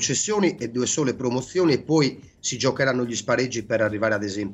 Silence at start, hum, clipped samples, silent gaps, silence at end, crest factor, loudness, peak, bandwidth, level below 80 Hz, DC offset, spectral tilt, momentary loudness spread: 0 s; none; under 0.1%; none; 0 s; 16 dB; -23 LUFS; -8 dBFS; 8.6 kHz; -58 dBFS; under 0.1%; -4 dB/octave; 5 LU